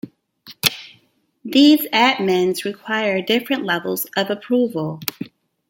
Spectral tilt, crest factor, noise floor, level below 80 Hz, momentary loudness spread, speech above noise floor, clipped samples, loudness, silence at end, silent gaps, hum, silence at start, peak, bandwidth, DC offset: -4 dB/octave; 20 dB; -59 dBFS; -66 dBFS; 17 LU; 41 dB; under 0.1%; -18 LUFS; 0.4 s; none; none; 0.05 s; 0 dBFS; 17 kHz; under 0.1%